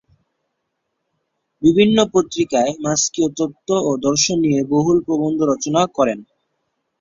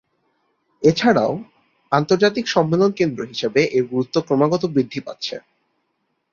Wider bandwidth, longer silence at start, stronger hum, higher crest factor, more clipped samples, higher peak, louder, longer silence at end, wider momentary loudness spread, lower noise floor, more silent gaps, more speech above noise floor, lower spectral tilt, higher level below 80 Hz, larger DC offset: about the same, 7.8 kHz vs 7.4 kHz; first, 1.6 s vs 0.8 s; neither; about the same, 18 dB vs 18 dB; neither; about the same, -2 dBFS vs -2 dBFS; about the same, -17 LUFS vs -19 LUFS; second, 0.75 s vs 0.95 s; second, 6 LU vs 11 LU; about the same, -74 dBFS vs -71 dBFS; neither; first, 58 dB vs 53 dB; second, -4.5 dB/octave vs -6 dB/octave; about the same, -54 dBFS vs -58 dBFS; neither